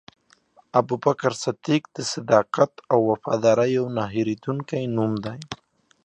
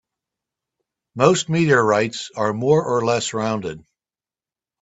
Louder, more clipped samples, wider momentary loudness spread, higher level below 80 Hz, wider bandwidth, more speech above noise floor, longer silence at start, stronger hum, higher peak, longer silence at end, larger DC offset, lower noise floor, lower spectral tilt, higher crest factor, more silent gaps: second, -23 LUFS vs -19 LUFS; neither; about the same, 9 LU vs 11 LU; about the same, -62 dBFS vs -60 dBFS; first, 10 kHz vs 8.2 kHz; second, 36 dB vs over 71 dB; second, 0.75 s vs 1.15 s; neither; second, -4 dBFS vs 0 dBFS; second, 0.5 s vs 1.05 s; neither; second, -58 dBFS vs under -90 dBFS; about the same, -6 dB/octave vs -5 dB/octave; about the same, 20 dB vs 20 dB; neither